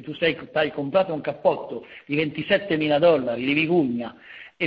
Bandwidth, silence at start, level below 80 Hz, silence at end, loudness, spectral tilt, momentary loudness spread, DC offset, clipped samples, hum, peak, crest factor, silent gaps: 5.2 kHz; 0 s; -60 dBFS; 0 s; -23 LUFS; -8.5 dB/octave; 16 LU; under 0.1%; under 0.1%; none; -6 dBFS; 18 dB; none